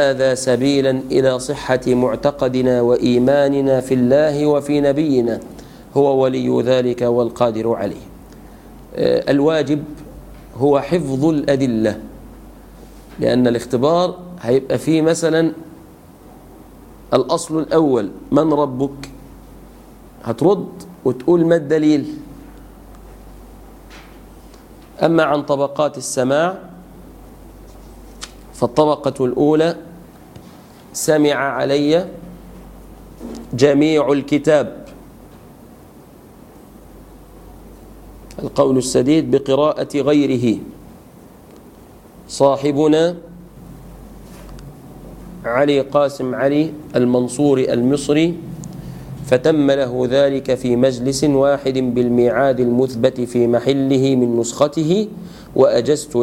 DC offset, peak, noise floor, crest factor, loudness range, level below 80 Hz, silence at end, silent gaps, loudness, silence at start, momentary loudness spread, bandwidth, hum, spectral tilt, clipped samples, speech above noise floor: under 0.1%; 0 dBFS; -42 dBFS; 18 dB; 5 LU; -46 dBFS; 0 s; none; -16 LUFS; 0 s; 18 LU; 16.5 kHz; none; -6 dB/octave; under 0.1%; 26 dB